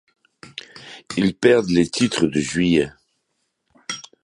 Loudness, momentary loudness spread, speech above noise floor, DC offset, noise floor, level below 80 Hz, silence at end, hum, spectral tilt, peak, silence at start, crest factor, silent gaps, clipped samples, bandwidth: -19 LUFS; 21 LU; 55 dB; under 0.1%; -73 dBFS; -50 dBFS; 0.2 s; none; -5 dB/octave; -2 dBFS; 0.75 s; 20 dB; none; under 0.1%; 11.5 kHz